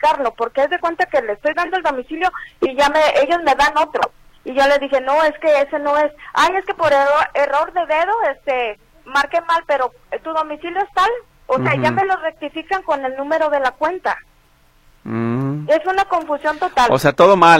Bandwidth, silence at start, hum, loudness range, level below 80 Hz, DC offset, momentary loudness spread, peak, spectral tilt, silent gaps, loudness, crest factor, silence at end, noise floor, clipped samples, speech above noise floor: 15.5 kHz; 0 s; none; 4 LU; -48 dBFS; under 0.1%; 9 LU; 0 dBFS; -5 dB/octave; none; -17 LUFS; 16 dB; 0 s; -53 dBFS; under 0.1%; 36 dB